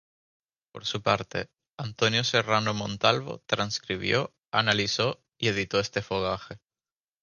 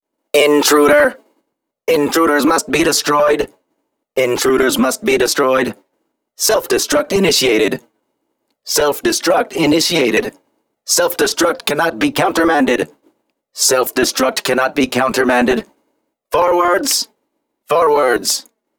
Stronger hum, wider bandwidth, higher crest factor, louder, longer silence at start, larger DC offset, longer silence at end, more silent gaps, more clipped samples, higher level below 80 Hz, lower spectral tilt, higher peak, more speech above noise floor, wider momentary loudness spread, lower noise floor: neither; second, 10 kHz vs over 20 kHz; first, 24 dB vs 16 dB; second, -27 LUFS vs -14 LUFS; first, 0.75 s vs 0.35 s; neither; first, 0.65 s vs 0.4 s; first, 1.73-1.78 s, 4.48-4.52 s vs none; neither; second, -58 dBFS vs -48 dBFS; first, -4 dB/octave vs -2.5 dB/octave; second, -6 dBFS vs 0 dBFS; first, over 63 dB vs 56 dB; first, 11 LU vs 7 LU; first, under -90 dBFS vs -71 dBFS